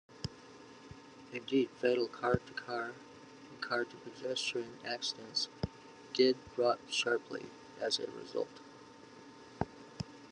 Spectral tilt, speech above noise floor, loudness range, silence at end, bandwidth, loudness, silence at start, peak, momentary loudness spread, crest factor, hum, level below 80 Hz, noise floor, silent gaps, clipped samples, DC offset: -4 dB/octave; 20 dB; 4 LU; 0 s; 10.5 kHz; -36 LUFS; 0.1 s; -14 dBFS; 22 LU; 22 dB; none; -66 dBFS; -55 dBFS; none; under 0.1%; under 0.1%